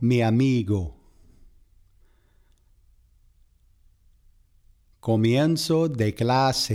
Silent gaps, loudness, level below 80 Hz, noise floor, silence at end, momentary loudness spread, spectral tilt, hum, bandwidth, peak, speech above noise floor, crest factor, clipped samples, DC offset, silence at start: none; -23 LUFS; -52 dBFS; -60 dBFS; 0 s; 7 LU; -6 dB/octave; none; 15.5 kHz; -10 dBFS; 38 dB; 16 dB; under 0.1%; under 0.1%; 0 s